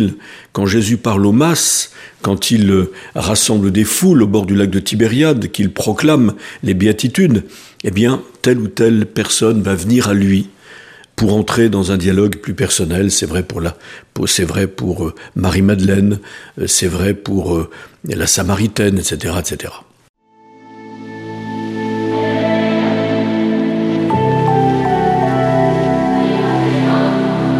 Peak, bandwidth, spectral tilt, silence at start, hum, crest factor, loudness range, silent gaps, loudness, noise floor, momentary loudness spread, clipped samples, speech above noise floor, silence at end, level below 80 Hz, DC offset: 0 dBFS; 15.5 kHz; -5 dB/octave; 0 s; none; 14 dB; 5 LU; 20.09-20.14 s; -14 LUFS; -45 dBFS; 11 LU; under 0.1%; 30 dB; 0 s; -40 dBFS; under 0.1%